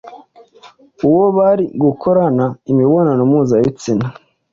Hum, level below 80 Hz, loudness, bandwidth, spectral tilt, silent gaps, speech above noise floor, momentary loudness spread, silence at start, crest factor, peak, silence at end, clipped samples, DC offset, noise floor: none; -52 dBFS; -14 LUFS; 7.6 kHz; -9 dB/octave; none; 31 dB; 7 LU; 0.05 s; 12 dB; -2 dBFS; 0.4 s; under 0.1%; under 0.1%; -44 dBFS